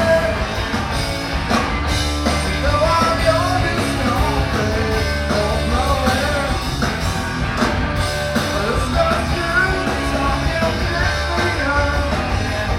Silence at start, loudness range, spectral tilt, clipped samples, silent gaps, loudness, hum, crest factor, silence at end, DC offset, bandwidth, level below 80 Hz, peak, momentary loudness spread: 0 s; 2 LU; -5 dB/octave; under 0.1%; none; -18 LUFS; none; 16 dB; 0 s; under 0.1%; 16.5 kHz; -26 dBFS; -2 dBFS; 5 LU